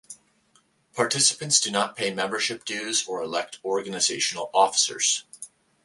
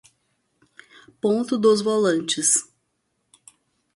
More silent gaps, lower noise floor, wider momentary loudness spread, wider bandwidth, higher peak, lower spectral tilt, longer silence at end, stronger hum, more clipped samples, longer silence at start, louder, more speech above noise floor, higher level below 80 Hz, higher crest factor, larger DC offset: neither; second, -64 dBFS vs -73 dBFS; first, 10 LU vs 5 LU; about the same, 11.5 kHz vs 11.5 kHz; about the same, -4 dBFS vs -6 dBFS; second, -1 dB/octave vs -3 dB/octave; second, 0.4 s vs 1.3 s; neither; neither; second, 0.1 s vs 1.25 s; second, -23 LUFS vs -20 LUFS; second, 39 dB vs 53 dB; about the same, -72 dBFS vs -70 dBFS; about the same, 22 dB vs 18 dB; neither